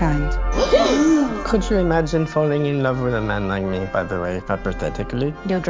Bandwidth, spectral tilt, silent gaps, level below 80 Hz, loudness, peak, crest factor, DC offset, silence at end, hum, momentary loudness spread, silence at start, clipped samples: 7.6 kHz; -6.5 dB/octave; none; -28 dBFS; -20 LUFS; -4 dBFS; 16 dB; under 0.1%; 0 s; none; 8 LU; 0 s; under 0.1%